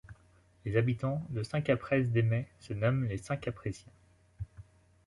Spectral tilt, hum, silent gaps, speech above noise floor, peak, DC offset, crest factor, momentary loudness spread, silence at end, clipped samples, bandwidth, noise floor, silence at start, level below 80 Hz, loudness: -8 dB/octave; none; none; 32 dB; -14 dBFS; under 0.1%; 18 dB; 17 LU; 0.45 s; under 0.1%; 11.5 kHz; -64 dBFS; 0.1 s; -56 dBFS; -33 LUFS